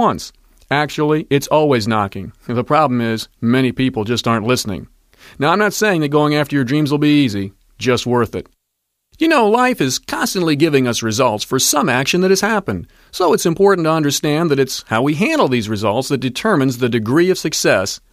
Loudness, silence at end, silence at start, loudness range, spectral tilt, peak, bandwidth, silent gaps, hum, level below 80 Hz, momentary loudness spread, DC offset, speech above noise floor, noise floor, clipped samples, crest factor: -16 LUFS; 0.15 s; 0 s; 2 LU; -4.5 dB/octave; -2 dBFS; 15.5 kHz; none; none; -50 dBFS; 7 LU; under 0.1%; 58 dB; -73 dBFS; under 0.1%; 14 dB